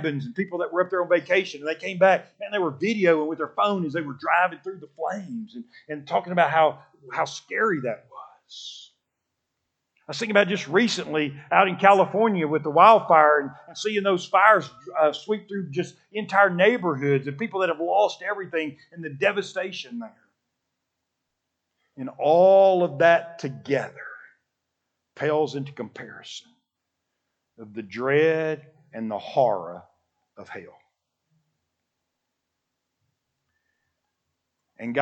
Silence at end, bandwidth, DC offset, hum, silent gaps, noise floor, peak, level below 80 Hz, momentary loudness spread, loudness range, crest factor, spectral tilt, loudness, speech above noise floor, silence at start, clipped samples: 0 s; 8.6 kHz; under 0.1%; none; none; -81 dBFS; 0 dBFS; -80 dBFS; 21 LU; 12 LU; 24 dB; -5.5 dB/octave; -22 LUFS; 58 dB; 0 s; under 0.1%